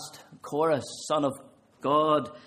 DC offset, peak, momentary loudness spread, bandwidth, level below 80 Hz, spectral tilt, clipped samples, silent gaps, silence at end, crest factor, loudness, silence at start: under 0.1%; -10 dBFS; 20 LU; 15 kHz; -72 dBFS; -5 dB/octave; under 0.1%; none; 0.05 s; 18 dB; -27 LUFS; 0 s